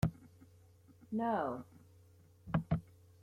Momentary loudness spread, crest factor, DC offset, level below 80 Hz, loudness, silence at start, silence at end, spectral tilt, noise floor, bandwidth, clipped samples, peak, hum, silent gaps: 23 LU; 22 dB; under 0.1%; -58 dBFS; -39 LUFS; 0 s; 0.4 s; -8.5 dB/octave; -63 dBFS; 15 kHz; under 0.1%; -18 dBFS; none; none